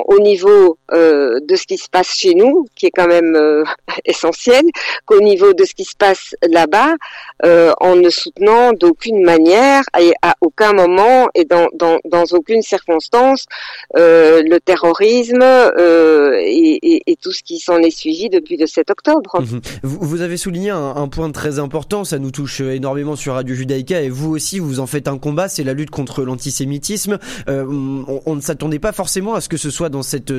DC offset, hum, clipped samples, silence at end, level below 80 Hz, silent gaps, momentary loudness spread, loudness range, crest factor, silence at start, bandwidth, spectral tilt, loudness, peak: under 0.1%; none; under 0.1%; 0 s; -44 dBFS; none; 12 LU; 10 LU; 10 dB; 0 s; 15 kHz; -5 dB/octave; -13 LUFS; -2 dBFS